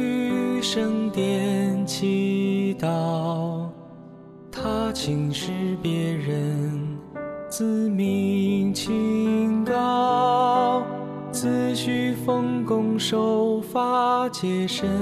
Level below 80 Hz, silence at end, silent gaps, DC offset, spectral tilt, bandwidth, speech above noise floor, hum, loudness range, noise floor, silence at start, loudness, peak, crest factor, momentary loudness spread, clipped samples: -56 dBFS; 0 s; none; under 0.1%; -6 dB/octave; 14 kHz; 20 dB; none; 5 LU; -43 dBFS; 0 s; -24 LUFS; -10 dBFS; 14 dB; 10 LU; under 0.1%